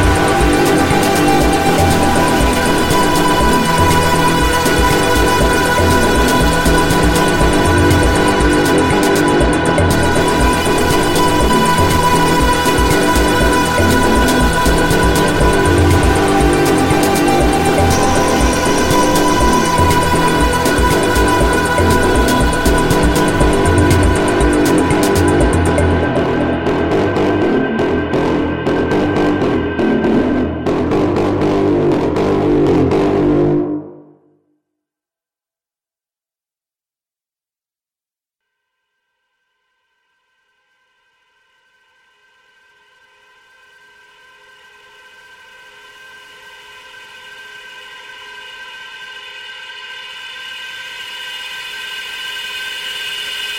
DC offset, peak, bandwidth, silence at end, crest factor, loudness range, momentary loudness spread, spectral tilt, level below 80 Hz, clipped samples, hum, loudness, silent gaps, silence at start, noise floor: under 0.1%; 0 dBFS; 16.5 kHz; 0 s; 14 dB; 14 LU; 14 LU; -5 dB/octave; -24 dBFS; under 0.1%; none; -13 LUFS; none; 0 s; under -90 dBFS